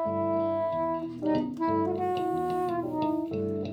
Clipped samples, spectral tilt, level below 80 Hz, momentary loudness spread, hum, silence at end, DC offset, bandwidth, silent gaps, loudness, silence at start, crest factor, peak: under 0.1%; -8.5 dB/octave; -62 dBFS; 3 LU; none; 0 s; under 0.1%; 13 kHz; none; -29 LUFS; 0 s; 12 dB; -16 dBFS